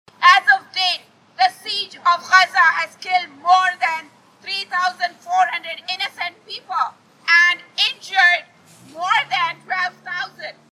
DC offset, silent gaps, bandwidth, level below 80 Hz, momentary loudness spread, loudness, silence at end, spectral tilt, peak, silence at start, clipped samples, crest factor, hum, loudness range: under 0.1%; none; 13 kHz; -84 dBFS; 14 LU; -18 LUFS; 0.2 s; 0.5 dB/octave; 0 dBFS; 0.2 s; under 0.1%; 18 dB; none; 4 LU